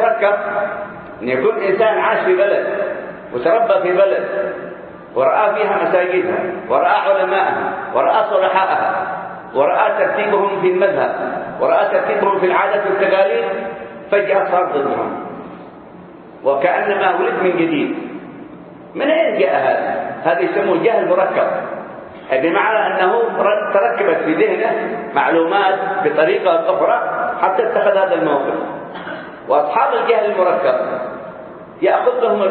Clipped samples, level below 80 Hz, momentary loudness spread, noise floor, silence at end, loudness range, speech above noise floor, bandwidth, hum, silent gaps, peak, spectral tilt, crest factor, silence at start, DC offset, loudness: under 0.1%; -62 dBFS; 13 LU; -37 dBFS; 0 s; 3 LU; 22 dB; 4.5 kHz; none; none; 0 dBFS; -10 dB/octave; 16 dB; 0 s; under 0.1%; -16 LUFS